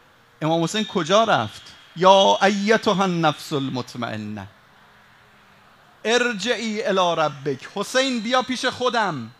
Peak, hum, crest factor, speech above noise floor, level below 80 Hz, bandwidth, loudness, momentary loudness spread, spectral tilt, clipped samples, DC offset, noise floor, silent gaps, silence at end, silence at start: 0 dBFS; none; 22 dB; 32 dB; -66 dBFS; 13.5 kHz; -21 LUFS; 13 LU; -4 dB/octave; under 0.1%; under 0.1%; -52 dBFS; none; 0.1 s; 0.4 s